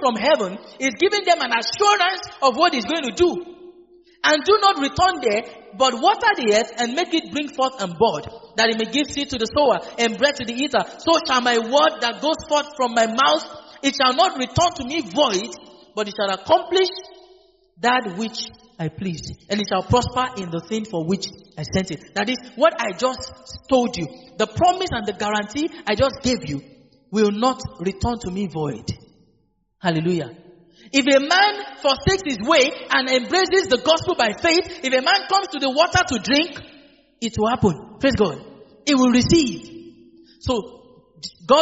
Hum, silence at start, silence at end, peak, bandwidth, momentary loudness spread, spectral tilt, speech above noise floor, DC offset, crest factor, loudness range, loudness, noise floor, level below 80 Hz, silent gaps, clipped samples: none; 0 s; 0 s; -2 dBFS; 8 kHz; 12 LU; -2.5 dB/octave; 45 dB; under 0.1%; 18 dB; 6 LU; -20 LUFS; -65 dBFS; -48 dBFS; none; under 0.1%